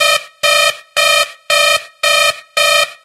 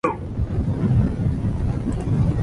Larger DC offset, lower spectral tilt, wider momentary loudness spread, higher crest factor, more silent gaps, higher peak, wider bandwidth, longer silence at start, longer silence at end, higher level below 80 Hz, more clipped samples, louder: neither; second, 2 dB/octave vs -9.5 dB/octave; about the same, 3 LU vs 5 LU; about the same, 12 dB vs 14 dB; neither; first, 0 dBFS vs -8 dBFS; first, 16 kHz vs 10.5 kHz; about the same, 0 s vs 0.05 s; about the same, 0.1 s vs 0 s; second, -56 dBFS vs -28 dBFS; neither; first, -11 LUFS vs -23 LUFS